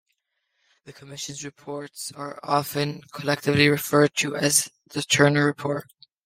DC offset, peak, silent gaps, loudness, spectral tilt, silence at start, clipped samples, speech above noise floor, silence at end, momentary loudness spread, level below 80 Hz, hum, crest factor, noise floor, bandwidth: under 0.1%; -4 dBFS; none; -23 LUFS; -3.5 dB/octave; 0.85 s; under 0.1%; 52 dB; 0.45 s; 16 LU; -62 dBFS; none; 22 dB; -76 dBFS; 16 kHz